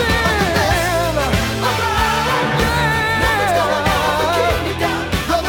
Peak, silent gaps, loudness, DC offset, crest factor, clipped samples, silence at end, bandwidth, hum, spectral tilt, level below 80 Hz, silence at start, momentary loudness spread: -2 dBFS; none; -16 LUFS; under 0.1%; 14 dB; under 0.1%; 0 s; over 20 kHz; none; -4 dB/octave; -28 dBFS; 0 s; 3 LU